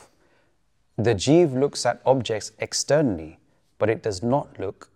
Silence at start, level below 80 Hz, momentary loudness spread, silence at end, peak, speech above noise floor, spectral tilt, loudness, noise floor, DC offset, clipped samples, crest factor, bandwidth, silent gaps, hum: 1 s; -56 dBFS; 15 LU; 0.25 s; -4 dBFS; 46 dB; -5 dB/octave; -23 LUFS; -69 dBFS; under 0.1%; under 0.1%; 20 dB; 13 kHz; none; none